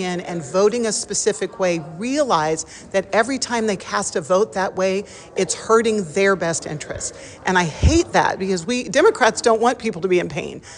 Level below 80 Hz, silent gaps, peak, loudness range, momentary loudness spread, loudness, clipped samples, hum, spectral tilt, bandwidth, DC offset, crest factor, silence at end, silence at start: -36 dBFS; none; -4 dBFS; 3 LU; 10 LU; -20 LUFS; under 0.1%; none; -4 dB/octave; 11 kHz; under 0.1%; 16 dB; 0 s; 0 s